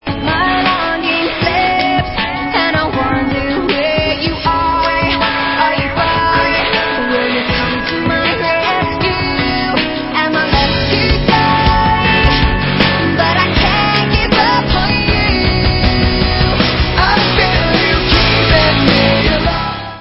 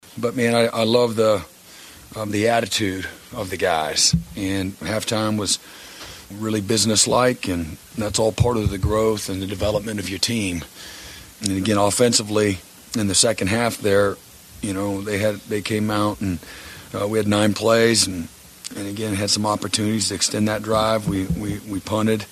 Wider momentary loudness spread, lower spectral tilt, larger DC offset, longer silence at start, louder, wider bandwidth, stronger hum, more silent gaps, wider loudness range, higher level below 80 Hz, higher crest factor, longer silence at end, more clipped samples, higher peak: second, 5 LU vs 15 LU; first, -7.5 dB/octave vs -4 dB/octave; neither; about the same, 0.05 s vs 0.1 s; first, -12 LUFS vs -21 LUFS; second, 7.4 kHz vs 14 kHz; neither; neither; about the same, 3 LU vs 3 LU; first, -22 dBFS vs -42 dBFS; second, 12 dB vs 20 dB; about the same, 0 s vs 0 s; neither; about the same, 0 dBFS vs -2 dBFS